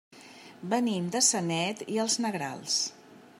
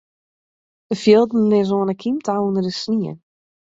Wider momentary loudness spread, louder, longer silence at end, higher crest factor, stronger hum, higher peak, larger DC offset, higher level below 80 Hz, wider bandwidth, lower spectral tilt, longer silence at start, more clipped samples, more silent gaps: first, 13 LU vs 9 LU; second, -28 LUFS vs -18 LUFS; second, 0.15 s vs 0.55 s; about the same, 22 dB vs 18 dB; neither; second, -10 dBFS vs -2 dBFS; neither; second, -80 dBFS vs -60 dBFS; first, 16 kHz vs 7.8 kHz; second, -2.5 dB/octave vs -6.5 dB/octave; second, 0.1 s vs 0.9 s; neither; neither